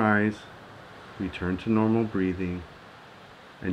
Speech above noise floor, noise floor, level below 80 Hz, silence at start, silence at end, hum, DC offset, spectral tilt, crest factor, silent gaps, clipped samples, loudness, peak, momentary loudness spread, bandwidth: 23 dB; -49 dBFS; -54 dBFS; 0 s; 0 s; none; under 0.1%; -8 dB/octave; 20 dB; none; under 0.1%; -28 LUFS; -8 dBFS; 24 LU; 8.8 kHz